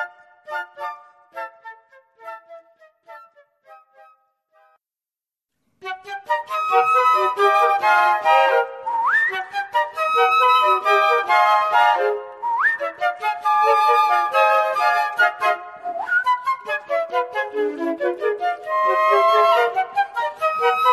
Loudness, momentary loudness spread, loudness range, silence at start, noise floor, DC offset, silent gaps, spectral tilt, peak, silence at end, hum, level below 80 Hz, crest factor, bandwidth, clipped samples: -18 LUFS; 16 LU; 9 LU; 0 s; under -90 dBFS; under 0.1%; none; -1.5 dB/octave; -4 dBFS; 0 s; none; -76 dBFS; 16 dB; 14 kHz; under 0.1%